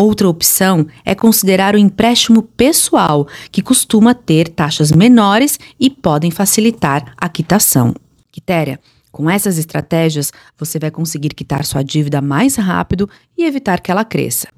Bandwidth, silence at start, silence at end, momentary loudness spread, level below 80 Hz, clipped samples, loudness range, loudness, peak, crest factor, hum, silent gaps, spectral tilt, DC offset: 16.5 kHz; 0 s; 0.1 s; 10 LU; -42 dBFS; under 0.1%; 6 LU; -13 LUFS; 0 dBFS; 12 dB; none; none; -4.5 dB/octave; under 0.1%